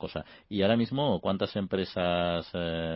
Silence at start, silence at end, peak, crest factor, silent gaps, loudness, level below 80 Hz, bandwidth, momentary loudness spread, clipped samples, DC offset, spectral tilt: 0 s; 0 s; -12 dBFS; 16 dB; none; -29 LUFS; -52 dBFS; 5.8 kHz; 9 LU; under 0.1%; under 0.1%; -10.5 dB/octave